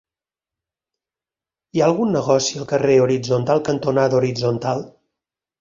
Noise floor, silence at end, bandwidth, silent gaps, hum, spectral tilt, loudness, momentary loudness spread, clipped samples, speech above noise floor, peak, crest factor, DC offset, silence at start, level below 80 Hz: -90 dBFS; 0.7 s; 7.6 kHz; none; none; -5.5 dB/octave; -19 LUFS; 7 LU; under 0.1%; 72 dB; -2 dBFS; 18 dB; under 0.1%; 1.75 s; -56 dBFS